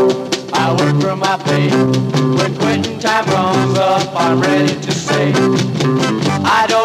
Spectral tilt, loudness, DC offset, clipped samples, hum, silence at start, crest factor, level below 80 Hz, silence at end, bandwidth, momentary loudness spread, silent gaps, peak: -5.5 dB/octave; -14 LUFS; under 0.1%; under 0.1%; none; 0 s; 12 dB; -54 dBFS; 0 s; 15 kHz; 3 LU; none; -2 dBFS